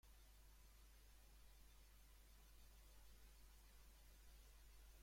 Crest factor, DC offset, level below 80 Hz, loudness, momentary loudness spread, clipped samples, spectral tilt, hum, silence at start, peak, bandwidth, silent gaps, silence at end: 12 dB; under 0.1%; -68 dBFS; -69 LUFS; 1 LU; under 0.1%; -3 dB/octave; none; 0.05 s; -54 dBFS; 16.5 kHz; none; 0 s